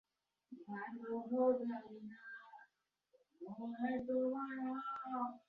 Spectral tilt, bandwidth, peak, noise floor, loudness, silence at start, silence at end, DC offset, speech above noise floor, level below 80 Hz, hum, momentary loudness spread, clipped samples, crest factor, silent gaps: -5.5 dB/octave; 4.8 kHz; -24 dBFS; -80 dBFS; -41 LUFS; 0.5 s; 0.1 s; under 0.1%; 39 dB; -82 dBFS; none; 19 LU; under 0.1%; 20 dB; none